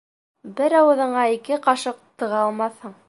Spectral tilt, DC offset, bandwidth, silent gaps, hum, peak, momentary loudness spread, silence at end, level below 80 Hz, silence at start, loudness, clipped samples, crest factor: -4 dB/octave; under 0.1%; 11.5 kHz; none; none; -4 dBFS; 13 LU; 0.15 s; -78 dBFS; 0.45 s; -20 LUFS; under 0.1%; 18 dB